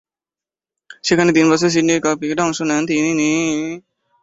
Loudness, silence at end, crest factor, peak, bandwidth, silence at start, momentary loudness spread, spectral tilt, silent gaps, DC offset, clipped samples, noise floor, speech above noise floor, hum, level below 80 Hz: -16 LUFS; 0.45 s; 16 dB; -2 dBFS; 8 kHz; 0.9 s; 10 LU; -4.5 dB/octave; none; under 0.1%; under 0.1%; under -90 dBFS; over 74 dB; none; -56 dBFS